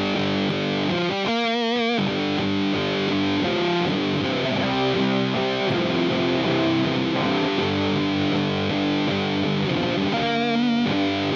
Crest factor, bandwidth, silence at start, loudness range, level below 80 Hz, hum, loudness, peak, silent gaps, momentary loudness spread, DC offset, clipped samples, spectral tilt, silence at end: 14 dB; 7.4 kHz; 0 s; 1 LU; -56 dBFS; none; -22 LUFS; -8 dBFS; none; 2 LU; under 0.1%; under 0.1%; -6 dB/octave; 0 s